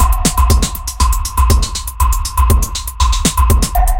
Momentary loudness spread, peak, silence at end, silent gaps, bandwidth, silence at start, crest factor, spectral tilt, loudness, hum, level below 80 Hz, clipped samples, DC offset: 4 LU; 0 dBFS; 0 s; none; 17.5 kHz; 0 s; 12 dB; -4 dB/octave; -14 LUFS; none; -14 dBFS; under 0.1%; under 0.1%